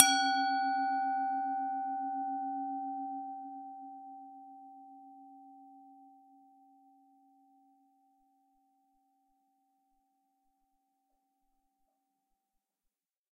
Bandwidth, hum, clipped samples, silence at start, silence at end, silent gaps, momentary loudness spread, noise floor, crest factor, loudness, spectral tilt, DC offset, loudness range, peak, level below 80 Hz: 5.8 kHz; none; under 0.1%; 0 s; 7.3 s; none; 24 LU; -88 dBFS; 38 dB; -33 LUFS; 3.5 dB/octave; under 0.1%; 24 LU; 0 dBFS; under -90 dBFS